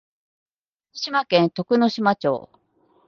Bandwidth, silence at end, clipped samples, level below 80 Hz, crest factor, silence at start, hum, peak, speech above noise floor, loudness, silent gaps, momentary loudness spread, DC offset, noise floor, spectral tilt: 7 kHz; 0.65 s; under 0.1%; -68 dBFS; 20 dB; 0.95 s; none; -4 dBFS; 40 dB; -21 LUFS; none; 11 LU; under 0.1%; -60 dBFS; -6 dB/octave